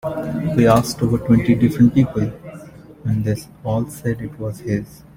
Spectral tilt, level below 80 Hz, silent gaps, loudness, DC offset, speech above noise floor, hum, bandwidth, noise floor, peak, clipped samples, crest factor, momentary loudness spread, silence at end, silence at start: -7.5 dB/octave; -42 dBFS; none; -19 LUFS; under 0.1%; 21 dB; none; 16.5 kHz; -39 dBFS; -2 dBFS; under 0.1%; 16 dB; 14 LU; 0.2 s; 0.05 s